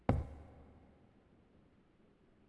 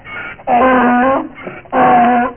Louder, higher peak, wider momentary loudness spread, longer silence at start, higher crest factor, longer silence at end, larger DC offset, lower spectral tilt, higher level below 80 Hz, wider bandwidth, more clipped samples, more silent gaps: second, -42 LUFS vs -12 LUFS; second, -14 dBFS vs 0 dBFS; first, 29 LU vs 16 LU; about the same, 0.1 s vs 0.05 s; first, 30 dB vs 12 dB; first, 1.85 s vs 0 s; second, under 0.1% vs 0.4%; about the same, -9.5 dB/octave vs -9.5 dB/octave; second, -50 dBFS vs -44 dBFS; first, 11 kHz vs 3.4 kHz; neither; neither